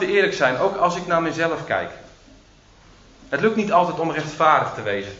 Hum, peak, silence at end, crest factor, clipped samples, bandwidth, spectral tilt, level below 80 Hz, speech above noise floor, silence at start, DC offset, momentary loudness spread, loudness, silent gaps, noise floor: none; -2 dBFS; 0 s; 20 dB; under 0.1%; 8 kHz; -5 dB/octave; -54 dBFS; 30 dB; 0 s; under 0.1%; 8 LU; -20 LUFS; none; -51 dBFS